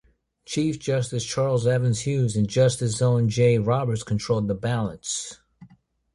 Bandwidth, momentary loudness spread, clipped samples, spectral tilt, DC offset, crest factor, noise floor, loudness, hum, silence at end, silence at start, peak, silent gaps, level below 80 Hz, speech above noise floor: 11.5 kHz; 8 LU; under 0.1%; -6 dB/octave; under 0.1%; 16 dB; -56 dBFS; -24 LUFS; none; 0.5 s; 0.5 s; -8 dBFS; none; -52 dBFS; 34 dB